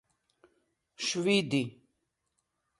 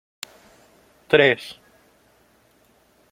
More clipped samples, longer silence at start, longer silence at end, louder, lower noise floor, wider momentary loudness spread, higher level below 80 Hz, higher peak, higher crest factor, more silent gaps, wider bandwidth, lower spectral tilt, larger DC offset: neither; about the same, 1 s vs 1.1 s; second, 1.1 s vs 1.6 s; second, -30 LUFS vs -18 LUFS; first, -81 dBFS vs -59 dBFS; second, 9 LU vs 23 LU; second, -76 dBFS vs -62 dBFS; second, -14 dBFS vs -2 dBFS; about the same, 22 dB vs 24 dB; neither; second, 11.5 kHz vs 16 kHz; about the same, -4 dB/octave vs -4.5 dB/octave; neither